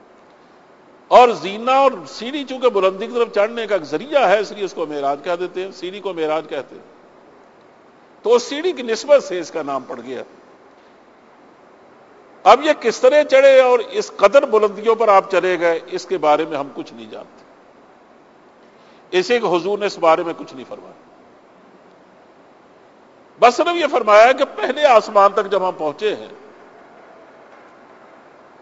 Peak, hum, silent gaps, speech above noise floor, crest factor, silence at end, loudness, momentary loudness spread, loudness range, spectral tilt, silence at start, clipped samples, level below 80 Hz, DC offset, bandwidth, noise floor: 0 dBFS; none; none; 32 dB; 18 dB; 2.25 s; -16 LUFS; 18 LU; 11 LU; -3.5 dB/octave; 1.1 s; under 0.1%; -64 dBFS; under 0.1%; 8 kHz; -48 dBFS